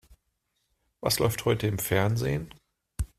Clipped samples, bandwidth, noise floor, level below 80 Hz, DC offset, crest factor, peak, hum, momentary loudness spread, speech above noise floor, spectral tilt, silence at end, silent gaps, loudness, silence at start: under 0.1%; 16 kHz; -77 dBFS; -46 dBFS; under 0.1%; 22 dB; -8 dBFS; none; 13 LU; 51 dB; -5 dB/octave; 0.1 s; none; -27 LUFS; 1 s